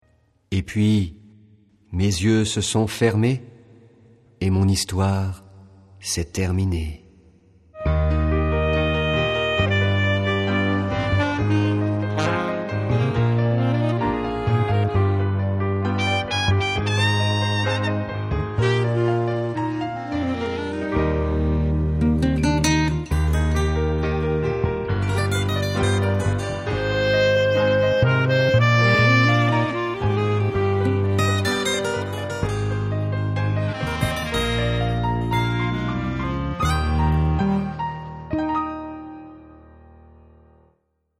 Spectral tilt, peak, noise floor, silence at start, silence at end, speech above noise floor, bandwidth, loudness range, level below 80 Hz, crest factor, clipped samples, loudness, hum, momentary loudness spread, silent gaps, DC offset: -6 dB/octave; -6 dBFS; -68 dBFS; 0.5 s; 1.65 s; 47 dB; 14 kHz; 6 LU; -32 dBFS; 16 dB; under 0.1%; -21 LUFS; none; 7 LU; none; under 0.1%